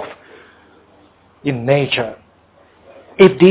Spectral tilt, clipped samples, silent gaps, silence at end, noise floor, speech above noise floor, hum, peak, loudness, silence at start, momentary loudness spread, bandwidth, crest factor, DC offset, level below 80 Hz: -11 dB/octave; 0.1%; none; 0 s; -51 dBFS; 39 dB; none; 0 dBFS; -15 LUFS; 0 s; 20 LU; 4 kHz; 18 dB; under 0.1%; -54 dBFS